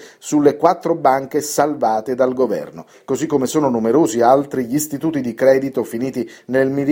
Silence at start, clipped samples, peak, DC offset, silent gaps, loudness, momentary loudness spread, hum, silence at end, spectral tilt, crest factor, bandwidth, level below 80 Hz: 0 s; under 0.1%; 0 dBFS; under 0.1%; none; -17 LUFS; 9 LU; none; 0 s; -5.5 dB/octave; 16 dB; 17 kHz; -60 dBFS